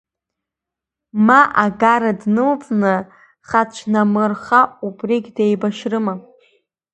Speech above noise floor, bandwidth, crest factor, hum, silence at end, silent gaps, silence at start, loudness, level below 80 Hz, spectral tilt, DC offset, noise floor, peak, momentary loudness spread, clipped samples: 69 dB; 8.6 kHz; 18 dB; none; 0.75 s; none; 1.15 s; -16 LUFS; -60 dBFS; -6.5 dB/octave; under 0.1%; -85 dBFS; 0 dBFS; 9 LU; under 0.1%